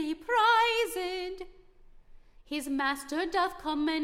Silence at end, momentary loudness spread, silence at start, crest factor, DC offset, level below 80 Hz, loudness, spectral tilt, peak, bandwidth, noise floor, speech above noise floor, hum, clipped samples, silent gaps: 0 s; 15 LU; 0 s; 16 dB; under 0.1%; -56 dBFS; -29 LUFS; -2 dB/octave; -14 dBFS; 16.5 kHz; -54 dBFS; 25 dB; none; under 0.1%; none